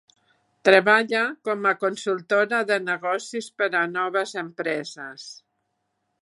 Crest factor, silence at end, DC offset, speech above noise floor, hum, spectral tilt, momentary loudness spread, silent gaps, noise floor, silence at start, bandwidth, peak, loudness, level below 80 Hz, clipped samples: 24 dB; 0.9 s; under 0.1%; 52 dB; none; -3.5 dB/octave; 16 LU; none; -76 dBFS; 0.65 s; 11.5 kHz; 0 dBFS; -23 LUFS; -80 dBFS; under 0.1%